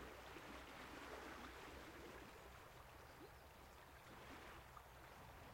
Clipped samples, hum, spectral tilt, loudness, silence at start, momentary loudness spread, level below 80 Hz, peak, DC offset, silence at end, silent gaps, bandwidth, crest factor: under 0.1%; none; -4 dB/octave; -58 LUFS; 0 s; 7 LU; -68 dBFS; -42 dBFS; under 0.1%; 0 s; none; 16.5 kHz; 16 dB